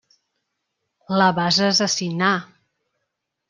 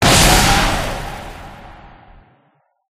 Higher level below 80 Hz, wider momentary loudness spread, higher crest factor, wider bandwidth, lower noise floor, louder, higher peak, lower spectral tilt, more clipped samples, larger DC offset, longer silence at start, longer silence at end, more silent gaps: second, -66 dBFS vs -26 dBFS; second, 7 LU vs 25 LU; about the same, 20 dB vs 18 dB; second, 10.5 kHz vs 15.5 kHz; first, -79 dBFS vs -60 dBFS; second, -19 LUFS vs -13 LUFS; about the same, -2 dBFS vs 0 dBFS; about the same, -3.5 dB/octave vs -3 dB/octave; neither; neither; first, 1.1 s vs 0 s; second, 1.05 s vs 1.25 s; neither